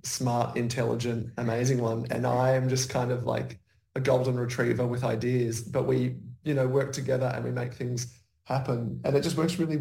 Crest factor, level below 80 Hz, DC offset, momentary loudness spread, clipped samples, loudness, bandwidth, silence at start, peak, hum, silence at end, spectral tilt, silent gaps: 16 dB; -60 dBFS; under 0.1%; 7 LU; under 0.1%; -28 LUFS; 16.5 kHz; 0.05 s; -12 dBFS; none; 0 s; -6 dB/octave; none